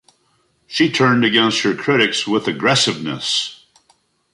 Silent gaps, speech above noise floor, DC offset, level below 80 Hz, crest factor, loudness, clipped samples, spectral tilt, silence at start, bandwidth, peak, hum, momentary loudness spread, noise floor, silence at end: none; 45 dB; under 0.1%; -60 dBFS; 16 dB; -16 LUFS; under 0.1%; -3.5 dB/octave; 0.7 s; 11.5 kHz; -2 dBFS; none; 6 LU; -62 dBFS; 0.8 s